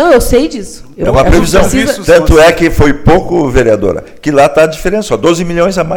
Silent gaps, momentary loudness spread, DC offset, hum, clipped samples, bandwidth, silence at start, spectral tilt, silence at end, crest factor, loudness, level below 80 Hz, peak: none; 9 LU; under 0.1%; none; 1%; 18.5 kHz; 0 s; -5.5 dB/octave; 0 s; 8 dB; -9 LUFS; -18 dBFS; 0 dBFS